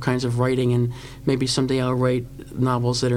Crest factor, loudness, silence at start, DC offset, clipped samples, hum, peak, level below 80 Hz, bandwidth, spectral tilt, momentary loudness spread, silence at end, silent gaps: 16 dB; -22 LUFS; 0 s; 0.2%; under 0.1%; none; -6 dBFS; -46 dBFS; 13 kHz; -6 dB/octave; 6 LU; 0 s; none